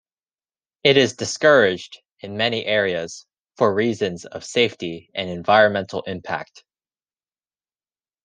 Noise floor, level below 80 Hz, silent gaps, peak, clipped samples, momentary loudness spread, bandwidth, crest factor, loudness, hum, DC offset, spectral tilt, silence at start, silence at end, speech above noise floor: under -90 dBFS; -68 dBFS; 2.12-2.17 s; -2 dBFS; under 0.1%; 16 LU; 10 kHz; 20 dB; -20 LUFS; none; under 0.1%; -4 dB/octave; 0.85 s; 1.8 s; over 70 dB